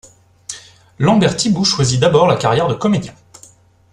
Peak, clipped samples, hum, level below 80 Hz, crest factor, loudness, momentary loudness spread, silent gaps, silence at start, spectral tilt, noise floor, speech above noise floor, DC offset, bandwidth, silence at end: 0 dBFS; under 0.1%; none; -48 dBFS; 16 dB; -14 LUFS; 19 LU; none; 0.5 s; -5 dB/octave; -47 dBFS; 33 dB; under 0.1%; 11.5 kHz; 0.8 s